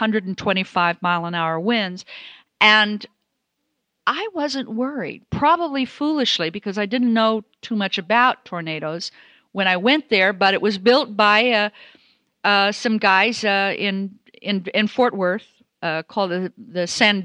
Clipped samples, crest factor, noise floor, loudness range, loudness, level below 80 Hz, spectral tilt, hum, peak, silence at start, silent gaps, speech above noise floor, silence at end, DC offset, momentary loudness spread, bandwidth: under 0.1%; 20 dB; -75 dBFS; 4 LU; -19 LUFS; -60 dBFS; -4.5 dB/octave; none; 0 dBFS; 0 s; none; 55 dB; 0 s; under 0.1%; 12 LU; 10.5 kHz